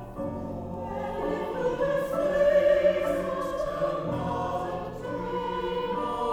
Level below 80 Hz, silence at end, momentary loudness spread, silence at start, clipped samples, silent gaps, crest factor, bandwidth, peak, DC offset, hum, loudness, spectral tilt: -48 dBFS; 0 s; 12 LU; 0 s; under 0.1%; none; 16 dB; 16.5 kHz; -12 dBFS; under 0.1%; none; -28 LUFS; -6.5 dB/octave